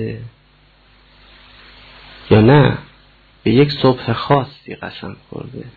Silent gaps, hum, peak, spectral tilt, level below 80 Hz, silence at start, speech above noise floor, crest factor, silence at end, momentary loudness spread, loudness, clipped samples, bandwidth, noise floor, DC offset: none; none; -2 dBFS; -10 dB/octave; -44 dBFS; 0 s; 36 dB; 16 dB; 0.05 s; 21 LU; -14 LUFS; under 0.1%; 4.8 kHz; -51 dBFS; under 0.1%